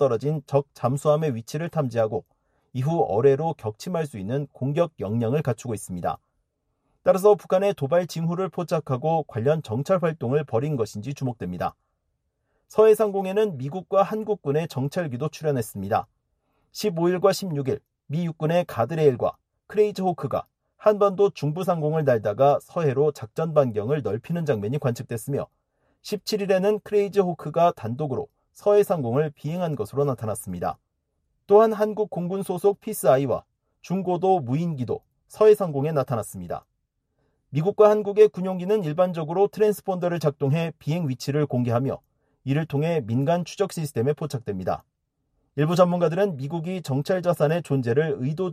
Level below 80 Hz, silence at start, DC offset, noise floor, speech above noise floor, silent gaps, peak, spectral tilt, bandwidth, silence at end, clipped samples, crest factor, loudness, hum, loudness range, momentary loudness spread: -62 dBFS; 0 s; under 0.1%; -75 dBFS; 52 dB; none; -4 dBFS; -7 dB/octave; 14.5 kHz; 0 s; under 0.1%; 20 dB; -24 LUFS; none; 4 LU; 11 LU